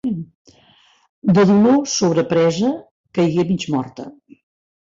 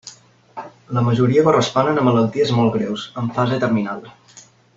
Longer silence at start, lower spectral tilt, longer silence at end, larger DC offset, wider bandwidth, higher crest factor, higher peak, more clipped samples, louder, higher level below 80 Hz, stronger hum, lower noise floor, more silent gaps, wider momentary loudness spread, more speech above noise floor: about the same, 0.05 s vs 0.05 s; about the same, -6 dB/octave vs -6.5 dB/octave; first, 0.85 s vs 0.35 s; neither; about the same, 7.6 kHz vs 7.8 kHz; about the same, 14 dB vs 16 dB; about the same, -4 dBFS vs -2 dBFS; neither; about the same, -17 LUFS vs -18 LUFS; about the same, -56 dBFS vs -54 dBFS; neither; first, -54 dBFS vs -47 dBFS; first, 0.35-0.45 s, 1.09-1.22 s, 2.91-3.04 s vs none; about the same, 18 LU vs 19 LU; first, 38 dB vs 30 dB